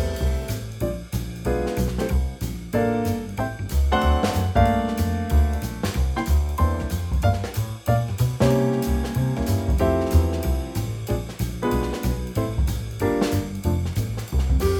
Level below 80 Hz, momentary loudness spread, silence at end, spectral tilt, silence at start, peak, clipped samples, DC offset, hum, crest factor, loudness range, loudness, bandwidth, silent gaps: -26 dBFS; 8 LU; 0 s; -6.5 dB/octave; 0 s; -4 dBFS; under 0.1%; under 0.1%; none; 18 dB; 3 LU; -24 LUFS; 19.5 kHz; none